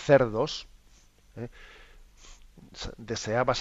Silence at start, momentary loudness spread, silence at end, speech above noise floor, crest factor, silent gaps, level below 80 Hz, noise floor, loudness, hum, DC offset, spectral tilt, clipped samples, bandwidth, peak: 0 s; 28 LU; 0 s; 31 dB; 24 dB; none; -50 dBFS; -58 dBFS; -29 LUFS; 50 Hz at -70 dBFS; under 0.1%; -5 dB/octave; under 0.1%; 8 kHz; -6 dBFS